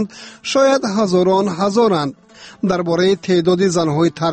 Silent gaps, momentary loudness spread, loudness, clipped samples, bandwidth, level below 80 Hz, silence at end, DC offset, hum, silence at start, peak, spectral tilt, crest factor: none; 7 LU; -16 LUFS; under 0.1%; 8.8 kHz; -54 dBFS; 0 s; under 0.1%; none; 0 s; -4 dBFS; -5.5 dB/octave; 12 dB